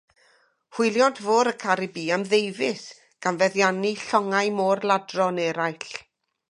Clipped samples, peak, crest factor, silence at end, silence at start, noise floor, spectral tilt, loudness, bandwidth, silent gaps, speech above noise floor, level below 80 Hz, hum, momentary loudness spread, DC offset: under 0.1%; -4 dBFS; 20 dB; 0.5 s; 0.75 s; -62 dBFS; -4 dB/octave; -23 LUFS; 11.5 kHz; none; 39 dB; -76 dBFS; none; 12 LU; under 0.1%